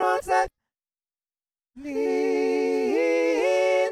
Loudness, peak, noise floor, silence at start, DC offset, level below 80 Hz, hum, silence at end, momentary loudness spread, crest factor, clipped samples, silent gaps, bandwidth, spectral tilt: -24 LUFS; -10 dBFS; under -90 dBFS; 0 s; under 0.1%; -58 dBFS; none; 0 s; 8 LU; 14 dB; under 0.1%; none; 13.5 kHz; -3.5 dB/octave